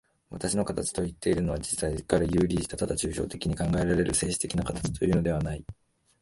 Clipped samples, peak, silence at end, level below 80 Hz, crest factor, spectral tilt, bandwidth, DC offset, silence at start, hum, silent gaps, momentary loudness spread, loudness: under 0.1%; -8 dBFS; 0.5 s; -42 dBFS; 20 dB; -5 dB/octave; 11.5 kHz; under 0.1%; 0.3 s; none; none; 6 LU; -28 LUFS